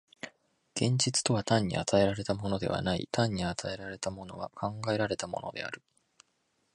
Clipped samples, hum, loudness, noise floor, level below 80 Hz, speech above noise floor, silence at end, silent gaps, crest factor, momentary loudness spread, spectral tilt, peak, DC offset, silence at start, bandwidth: under 0.1%; none; -31 LUFS; -76 dBFS; -56 dBFS; 45 dB; 0.95 s; none; 22 dB; 14 LU; -4.5 dB/octave; -10 dBFS; under 0.1%; 0.25 s; 11.5 kHz